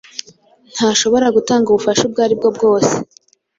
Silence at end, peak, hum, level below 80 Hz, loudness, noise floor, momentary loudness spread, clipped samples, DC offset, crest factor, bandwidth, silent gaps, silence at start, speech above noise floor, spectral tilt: 0.55 s; -2 dBFS; none; -54 dBFS; -14 LUFS; -48 dBFS; 16 LU; under 0.1%; under 0.1%; 14 dB; 7.8 kHz; none; 0.15 s; 34 dB; -3.5 dB/octave